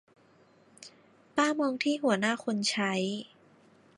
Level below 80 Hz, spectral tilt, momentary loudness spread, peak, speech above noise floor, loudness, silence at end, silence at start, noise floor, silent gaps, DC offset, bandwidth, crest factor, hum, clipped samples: -80 dBFS; -4 dB/octave; 23 LU; -12 dBFS; 33 dB; -29 LUFS; 0.7 s; 0.8 s; -62 dBFS; none; under 0.1%; 11.5 kHz; 20 dB; none; under 0.1%